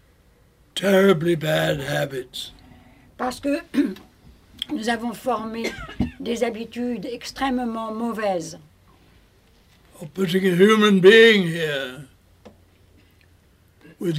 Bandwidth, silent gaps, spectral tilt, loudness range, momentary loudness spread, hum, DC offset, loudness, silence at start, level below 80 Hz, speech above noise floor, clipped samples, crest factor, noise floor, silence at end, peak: 16 kHz; none; -5.5 dB/octave; 10 LU; 18 LU; none; under 0.1%; -21 LUFS; 0.75 s; -52 dBFS; 36 dB; under 0.1%; 20 dB; -56 dBFS; 0 s; -2 dBFS